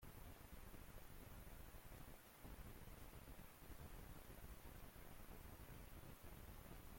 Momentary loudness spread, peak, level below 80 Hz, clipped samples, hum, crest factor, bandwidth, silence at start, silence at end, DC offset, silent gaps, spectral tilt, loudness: 2 LU; -46 dBFS; -62 dBFS; under 0.1%; none; 12 dB; 16.5 kHz; 0 s; 0 s; under 0.1%; none; -4.5 dB/octave; -61 LUFS